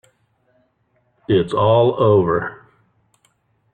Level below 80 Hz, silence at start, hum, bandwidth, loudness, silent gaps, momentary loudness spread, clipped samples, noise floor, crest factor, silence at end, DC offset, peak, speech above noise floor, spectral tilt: -52 dBFS; 1.3 s; none; 9.4 kHz; -16 LUFS; none; 12 LU; under 0.1%; -64 dBFS; 16 dB; 1.2 s; under 0.1%; -4 dBFS; 49 dB; -8.5 dB/octave